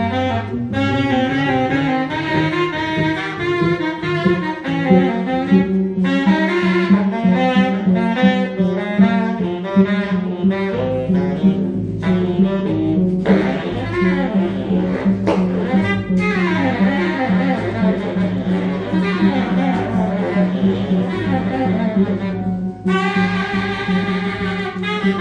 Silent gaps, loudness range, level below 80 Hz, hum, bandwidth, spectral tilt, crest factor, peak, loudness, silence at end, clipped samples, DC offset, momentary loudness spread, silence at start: none; 3 LU; -42 dBFS; none; 7.2 kHz; -8 dB/octave; 16 dB; 0 dBFS; -17 LUFS; 0 s; under 0.1%; under 0.1%; 5 LU; 0 s